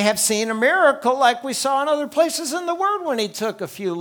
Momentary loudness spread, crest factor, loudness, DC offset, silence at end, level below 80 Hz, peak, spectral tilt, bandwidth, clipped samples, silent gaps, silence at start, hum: 9 LU; 18 dB; -20 LUFS; under 0.1%; 0 s; -70 dBFS; -2 dBFS; -2.5 dB/octave; over 20 kHz; under 0.1%; none; 0 s; none